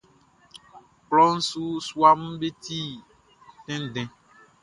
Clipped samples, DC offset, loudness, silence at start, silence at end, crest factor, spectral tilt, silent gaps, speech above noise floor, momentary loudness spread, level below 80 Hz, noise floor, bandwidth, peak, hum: under 0.1%; under 0.1%; -23 LUFS; 0.55 s; 0.55 s; 22 dB; -4.5 dB/octave; none; 36 dB; 16 LU; -64 dBFS; -59 dBFS; 11.5 kHz; -4 dBFS; none